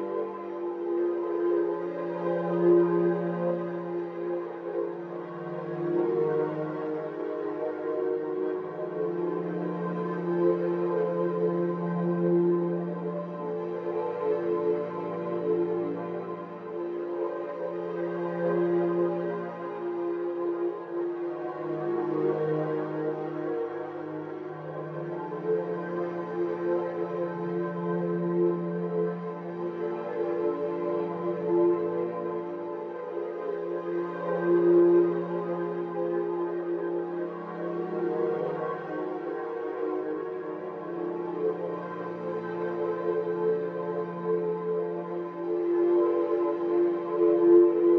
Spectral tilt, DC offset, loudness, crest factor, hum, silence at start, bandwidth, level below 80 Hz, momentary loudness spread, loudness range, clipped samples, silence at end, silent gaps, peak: -10.5 dB/octave; under 0.1%; -29 LUFS; 18 dB; none; 0 s; 4.2 kHz; -86 dBFS; 10 LU; 5 LU; under 0.1%; 0 s; none; -10 dBFS